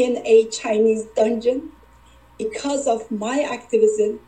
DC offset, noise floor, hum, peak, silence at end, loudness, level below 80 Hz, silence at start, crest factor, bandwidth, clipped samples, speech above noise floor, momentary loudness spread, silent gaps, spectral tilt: 0.1%; -50 dBFS; none; -4 dBFS; 0.1 s; -20 LUFS; -56 dBFS; 0 s; 16 dB; 9 kHz; under 0.1%; 30 dB; 10 LU; none; -4 dB/octave